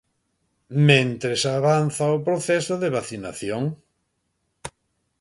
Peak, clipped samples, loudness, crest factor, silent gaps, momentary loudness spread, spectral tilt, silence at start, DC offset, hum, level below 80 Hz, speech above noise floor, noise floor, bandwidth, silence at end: -2 dBFS; under 0.1%; -22 LUFS; 22 dB; none; 23 LU; -5 dB/octave; 0.7 s; under 0.1%; none; -60 dBFS; 52 dB; -73 dBFS; 11.5 kHz; 0.5 s